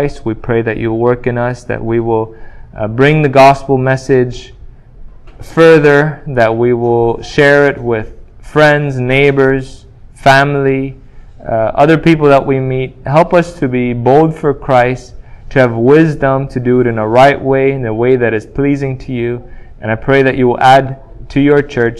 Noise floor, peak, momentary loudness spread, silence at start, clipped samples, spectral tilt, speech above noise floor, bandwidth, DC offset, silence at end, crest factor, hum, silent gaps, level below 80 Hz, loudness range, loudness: -32 dBFS; 0 dBFS; 11 LU; 0 s; 0.8%; -7 dB/octave; 22 dB; 12.5 kHz; under 0.1%; 0 s; 10 dB; none; none; -34 dBFS; 2 LU; -11 LUFS